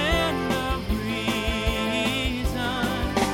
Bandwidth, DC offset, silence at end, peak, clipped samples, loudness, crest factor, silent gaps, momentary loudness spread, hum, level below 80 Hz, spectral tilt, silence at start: 16.5 kHz; under 0.1%; 0 s; -10 dBFS; under 0.1%; -25 LUFS; 16 dB; none; 3 LU; none; -32 dBFS; -4.5 dB/octave; 0 s